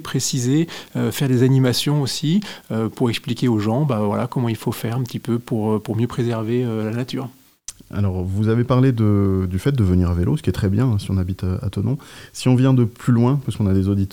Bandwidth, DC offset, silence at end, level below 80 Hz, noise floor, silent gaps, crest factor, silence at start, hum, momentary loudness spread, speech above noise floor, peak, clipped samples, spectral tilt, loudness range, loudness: 17 kHz; 0.2%; 0 s; -48 dBFS; -40 dBFS; none; 16 dB; 0 s; none; 8 LU; 21 dB; -4 dBFS; under 0.1%; -6.5 dB/octave; 4 LU; -20 LUFS